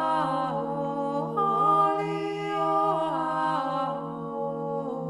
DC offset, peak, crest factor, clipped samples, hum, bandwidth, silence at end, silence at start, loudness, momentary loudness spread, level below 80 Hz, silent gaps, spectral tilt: under 0.1%; -12 dBFS; 14 dB; under 0.1%; none; 12 kHz; 0 s; 0 s; -27 LUFS; 9 LU; -68 dBFS; none; -7 dB/octave